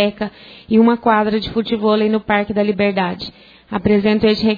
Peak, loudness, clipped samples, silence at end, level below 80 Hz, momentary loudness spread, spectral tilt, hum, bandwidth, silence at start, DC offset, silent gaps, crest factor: -2 dBFS; -16 LUFS; under 0.1%; 0 s; -46 dBFS; 13 LU; -8 dB/octave; none; 5 kHz; 0 s; under 0.1%; none; 14 dB